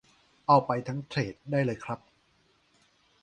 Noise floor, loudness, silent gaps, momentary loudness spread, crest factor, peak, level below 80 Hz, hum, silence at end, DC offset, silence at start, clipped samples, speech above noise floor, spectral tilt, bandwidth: -68 dBFS; -29 LUFS; none; 14 LU; 22 dB; -8 dBFS; -66 dBFS; none; 1.25 s; under 0.1%; 0.5 s; under 0.1%; 40 dB; -7 dB/octave; 9.4 kHz